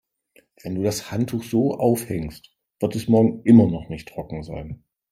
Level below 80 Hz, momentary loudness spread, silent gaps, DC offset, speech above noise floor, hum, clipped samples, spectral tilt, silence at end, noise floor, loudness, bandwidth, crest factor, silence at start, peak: -50 dBFS; 20 LU; none; under 0.1%; 39 dB; none; under 0.1%; -7 dB/octave; 0.35 s; -60 dBFS; -21 LUFS; 15.5 kHz; 20 dB; 0.65 s; -2 dBFS